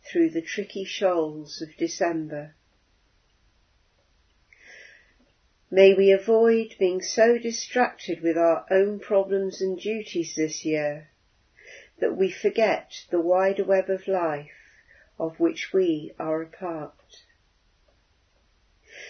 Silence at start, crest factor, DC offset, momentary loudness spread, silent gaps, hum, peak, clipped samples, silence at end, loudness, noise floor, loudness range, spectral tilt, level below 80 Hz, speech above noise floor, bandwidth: 0.05 s; 22 dB; under 0.1%; 13 LU; none; none; -4 dBFS; under 0.1%; 0 s; -24 LUFS; -65 dBFS; 10 LU; -4.5 dB/octave; -70 dBFS; 41 dB; 6.6 kHz